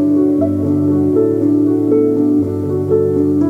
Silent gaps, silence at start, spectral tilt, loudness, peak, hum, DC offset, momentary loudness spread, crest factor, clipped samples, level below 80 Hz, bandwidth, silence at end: none; 0 s; -11 dB/octave; -14 LUFS; -2 dBFS; none; under 0.1%; 2 LU; 10 dB; under 0.1%; -54 dBFS; 2.4 kHz; 0 s